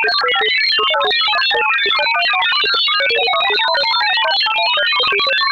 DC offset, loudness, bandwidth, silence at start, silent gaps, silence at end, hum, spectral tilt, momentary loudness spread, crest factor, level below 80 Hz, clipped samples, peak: under 0.1%; -13 LUFS; 16 kHz; 0 s; none; 0 s; none; -1 dB/octave; 1 LU; 10 dB; -60 dBFS; under 0.1%; -6 dBFS